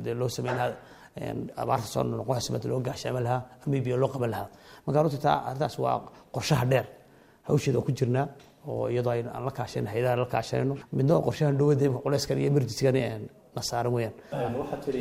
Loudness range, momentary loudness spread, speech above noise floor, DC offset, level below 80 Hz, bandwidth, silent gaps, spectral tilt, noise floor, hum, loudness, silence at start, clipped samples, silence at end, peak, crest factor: 4 LU; 11 LU; 27 dB; under 0.1%; -58 dBFS; 16 kHz; none; -6.5 dB/octave; -55 dBFS; none; -28 LUFS; 0 s; under 0.1%; 0 s; -8 dBFS; 20 dB